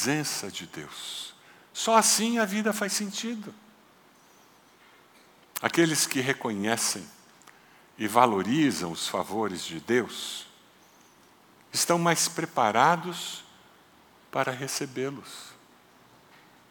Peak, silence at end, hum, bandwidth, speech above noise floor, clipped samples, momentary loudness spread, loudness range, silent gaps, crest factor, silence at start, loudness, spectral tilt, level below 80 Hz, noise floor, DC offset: -4 dBFS; 1.15 s; none; 19 kHz; 31 dB; under 0.1%; 17 LU; 6 LU; none; 26 dB; 0 s; -27 LUFS; -3 dB/octave; -78 dBFS; -58 dBFS; under 0.1%